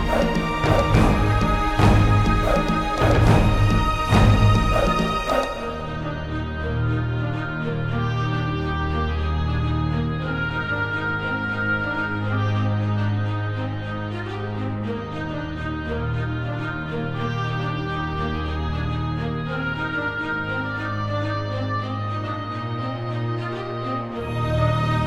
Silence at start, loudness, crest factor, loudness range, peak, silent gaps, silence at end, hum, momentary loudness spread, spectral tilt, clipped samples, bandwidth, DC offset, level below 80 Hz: 0 s; -23 LUFS; 18 dB; 8 LU; -4 dBFS; none; 0 s; none; 10 LU; -7 dB/octave; under 0.1%; 12.5 kHz; under 0.1%; -30 dBFS